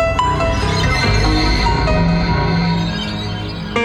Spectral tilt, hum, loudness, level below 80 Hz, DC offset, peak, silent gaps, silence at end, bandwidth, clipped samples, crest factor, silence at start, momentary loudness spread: -5.5 dB/octave; none; -16 LUFS; -22 dBFS; under 0.1%; -2 dBFS; none; 0 s; 11.5 kHz; under 0.1%; 12 dB; 0 s; 7 LU